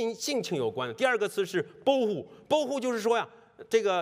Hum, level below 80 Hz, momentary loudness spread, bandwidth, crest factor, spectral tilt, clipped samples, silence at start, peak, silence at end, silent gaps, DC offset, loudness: none; -76 dBFS; 5 LU; 16 kHz; 18 dB; -4 dB/octave; under 0.1%; 0 s; -12 dBFS; 0 s; none; under 0.1%; -29 LUFS